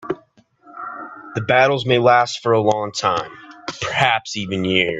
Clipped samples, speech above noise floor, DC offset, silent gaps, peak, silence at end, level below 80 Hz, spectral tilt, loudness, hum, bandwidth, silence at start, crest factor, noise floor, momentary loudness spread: under 0.1%; 36 dB; under 0.1%; none; 0 dBFS; 0 s; -56 dBFS; -4.5 dB/octave; -18 LUFS; none; 8.4 kHz; 0 s; 18 dB; -53 dBFS; 17 LU